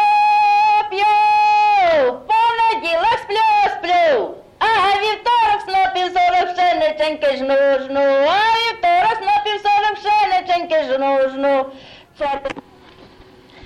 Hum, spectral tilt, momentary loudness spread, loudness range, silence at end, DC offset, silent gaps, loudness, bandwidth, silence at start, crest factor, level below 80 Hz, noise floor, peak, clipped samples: none; -3 dB/octave; 6 LU; 3 LU; 1.05 s; under 0.1%; none; -16 LUFS; 11.5 kHz; 0 s; 8 dB; -52 dBFS; -45 dBFS; -8 dBFS; under 0.1%